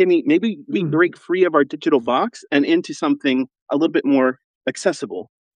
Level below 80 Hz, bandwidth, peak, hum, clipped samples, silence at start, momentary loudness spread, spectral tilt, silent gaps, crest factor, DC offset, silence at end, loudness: -76 dBFS; 10 kHz; -2 dBFS; none; under 0.1%; 0 s; 7 LU; -5.5 dB/octave; 3.61-3.66 s, 4.44-4.61 s; 16 dB; under 0.1%; 0.3 s; -19 LUFS